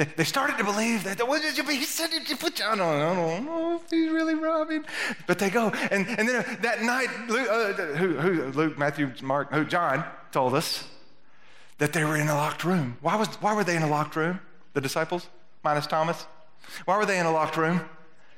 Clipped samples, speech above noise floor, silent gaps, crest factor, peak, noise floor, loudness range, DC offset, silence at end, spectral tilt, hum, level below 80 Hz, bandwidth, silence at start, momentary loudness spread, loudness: under 0.1%; 33 dB; none; 20 dB; -8 dBFS; -59 dBFS; 2 LU; 0.4%; 0.35 s; -4.5 dB/octave; none; -72 dBFS; 16.5 kHz; 0 s; 6 LU; -26 LUFS